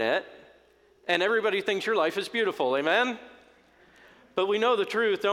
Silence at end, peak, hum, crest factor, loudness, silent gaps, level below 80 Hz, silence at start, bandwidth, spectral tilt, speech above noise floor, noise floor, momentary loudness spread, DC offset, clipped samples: 0 s; -8 dBFS; none; 20 dB; -26 LUFS; none; -74 dBFS; 0 s; 15.5 kHz; -3.5 dB/octave; 34 dB; -60 dBFS; 6 LU; under 0.1%; under 0.1%